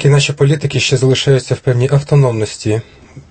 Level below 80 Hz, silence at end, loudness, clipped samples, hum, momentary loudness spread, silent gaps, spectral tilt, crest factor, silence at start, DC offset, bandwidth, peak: -44 dBFS; 0.1 s; -13 LUFS; under 0.1%; none; 7 LU; none; -5.5 dB/octave; 12 dB; 0 s; under 0.1%; 8.8 kHz; 0 dBFS